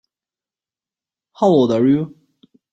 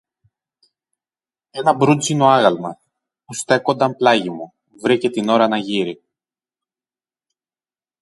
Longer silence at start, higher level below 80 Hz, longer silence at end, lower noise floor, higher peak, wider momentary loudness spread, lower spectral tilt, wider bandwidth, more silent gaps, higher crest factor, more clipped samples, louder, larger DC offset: second, 1.4 s vs 1.55 s; about the same, -60 dBFS vs -64 dBFS; second, 0.65 s vs 2.05 s; about the same, under -90 dBFS vs under -90 dBFS; about the same, -2 dBFS vs 0 dBFS; second, 7 LU vs 17 LU; first, -8 dB/octave vs -5 dB/octave; second, 7.8 kHz vs 11.5 kHz; neither; about the same, 16 dB vs 20 dB; neither; about the same, -16 LUFS vs -17 LUFS; neither